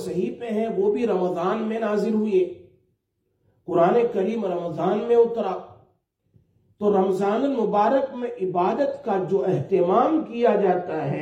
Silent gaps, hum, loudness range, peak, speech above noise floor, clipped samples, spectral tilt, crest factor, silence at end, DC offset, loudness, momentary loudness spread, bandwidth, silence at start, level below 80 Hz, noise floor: none; none; 2 LU; -6 dBFS; 51 dB; under 0.1%; -8 dB/octave; 16 dB; 0 s; under 0.1%; -23 LUFS; 8 LU; 10.5 kHz; 0 s; -68 dBFS; -73 dBFS